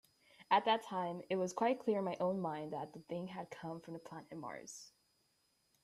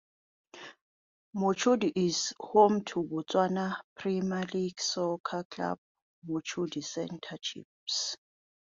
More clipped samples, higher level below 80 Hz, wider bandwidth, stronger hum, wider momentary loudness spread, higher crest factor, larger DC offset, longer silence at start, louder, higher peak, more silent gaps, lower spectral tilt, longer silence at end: neither; second, -82 dBFS vs -72 dBFS; first, 13.5 kHz vs 7.8 kHz; neither; about the same, 16 LU vs 16 LU; about the same, 22 dB vs 22 dB; neither; second, 0.4 s vs 0.55 s; second, -39 LUFS vs -31 LUFS; second, -18 dBFS vs -10 dBFS; second, none vs 0.82-1.33 s, 3.84-3.96 s, 5.20-5.24 s, 5.45-5.50 s, 5.78-5.95 s, 6.02-6.22 s, 7.65-7.87 s; about the same, -5 dB/octave vs -4.5 dB/octave; first, 0.95 s vs 0.5 s